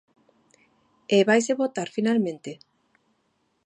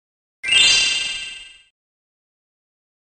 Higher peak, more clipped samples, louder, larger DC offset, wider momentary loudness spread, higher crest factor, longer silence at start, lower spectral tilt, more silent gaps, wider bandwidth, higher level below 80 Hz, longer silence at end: second, -6 dBFS vs -2 dBFS; neither; second, -23 LUFS vs -14 LUFS; neither; about the same, 20 LU vs 19 LU; about the same, 20 dB vs 22 dB; first, 1.1 s vs 0.45 s; first, -4.5 dB/octave vs 2.5 dB/octave; neither; about the same, 10.5 kHz vs 10 kHz; second, -78 dBFS vs -54 dBFS; second, 1.1 s vs 1.55 s